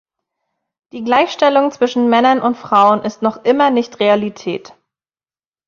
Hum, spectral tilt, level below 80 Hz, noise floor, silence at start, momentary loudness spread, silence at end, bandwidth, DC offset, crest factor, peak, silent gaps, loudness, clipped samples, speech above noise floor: none; -5 dB/octave; -62 dBFS; under -90 dBFS; 0.95 s; 13 LU; 1.1 s; 7.2 kHz; under 0.1%; 14 dB; -2 dBFS; none; -14 LUFS; under 0.1%; over 76 dB